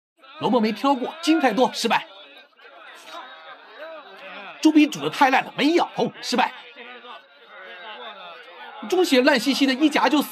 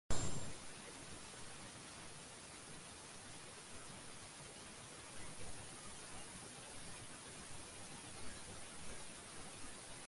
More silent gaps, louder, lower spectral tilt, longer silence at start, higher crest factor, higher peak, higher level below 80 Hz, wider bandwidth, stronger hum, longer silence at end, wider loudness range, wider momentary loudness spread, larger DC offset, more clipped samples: neither; first, -20 LUFS vs -51 LUFS; first, -4 dB/octave vs -2.5 dB/octave; first, 0.35 s vs 0.1 s; second, 18 dB vs 24 dB; first, -4 dBFS vs -22 dBFS; second, -88 dBFS vs -62 dBFS; first, 14.5 kHz vs 11.5 kHz; neither; about the same, 0 s vs 0 s; first, 6 LU vs 1 LU; first, 22 LU vs 2 LU; neither; neither